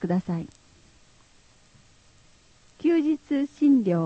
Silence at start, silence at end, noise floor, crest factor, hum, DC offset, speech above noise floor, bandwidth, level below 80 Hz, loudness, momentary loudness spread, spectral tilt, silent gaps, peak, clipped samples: 0 s; 0 s; -57 dBFS; 14 dB; none; under 0.1%; 34 dB; 8.4 kHz; -62 dBFS; -24 LUFS; 12 LU; -8.5 dB/octave; none; -12 dBFS; under 0.1%